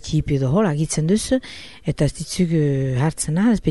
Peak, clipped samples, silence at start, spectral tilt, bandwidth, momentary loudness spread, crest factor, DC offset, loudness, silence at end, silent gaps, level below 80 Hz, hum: -6 dBFS; under 0.1%; 0.05 s; -6 dB/octave; 11.5 kHz; 5 LU; 14 dB; 0.5%; -20 LUFS; 0 s; none; -38 dBFS; none